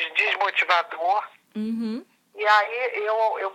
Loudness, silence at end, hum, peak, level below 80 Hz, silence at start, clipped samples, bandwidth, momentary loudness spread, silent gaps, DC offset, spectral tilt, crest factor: -23 LUFS; 0 s; none; -6 dBFS; -84 dBFS; 0 s; under 0.1%; 15 kHz; 12 LU; none; under 0.1%; -4 dB/octave; 18 dB